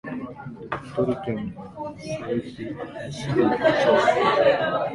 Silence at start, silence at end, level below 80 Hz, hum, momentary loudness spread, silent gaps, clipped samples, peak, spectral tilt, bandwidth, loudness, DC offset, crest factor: 0.05 s; 0 s; -54 dBFS; none; 16 LU; none; under 0.1%; -6 dBFS; -6 dB/octave; 11.5 kHz; -23 LUFS; under 0.1%; 18 dB